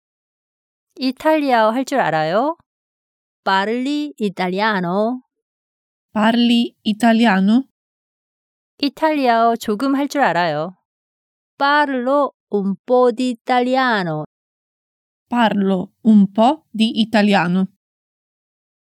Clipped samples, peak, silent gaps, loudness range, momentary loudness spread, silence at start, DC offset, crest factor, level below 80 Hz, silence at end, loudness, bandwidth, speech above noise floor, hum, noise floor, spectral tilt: under 0.1%; -2 dBFS; 2.66-3.43 s, 5.42-6.09 s, 7.71-8.78 s, 10.85-11.58 s, 12.34-12.47 s, 12.79-12.85 s, 13.41-13.45 s, 14.26-15.26 s; 3 LU; 10 LU; 0.95 s; under 0.1%; 16 dB; -70 dBFS; 1.3 s; -17 LUFS; 14 kHz; over 74 dB; none; under -90 dBFS; -6 dB/octave